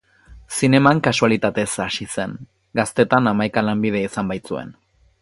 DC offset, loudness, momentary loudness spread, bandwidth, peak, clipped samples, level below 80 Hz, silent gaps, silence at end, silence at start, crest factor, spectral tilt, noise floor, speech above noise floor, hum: under 0.1%; -19 LUFS; 14 LU; 11.5 kHz; 0 dBFS; under 0.1%; -52 dBFS; none; 0.5 s; 0.3 s; 20 dB; -5 dB/octave; -46 dBFS; 27 dB; none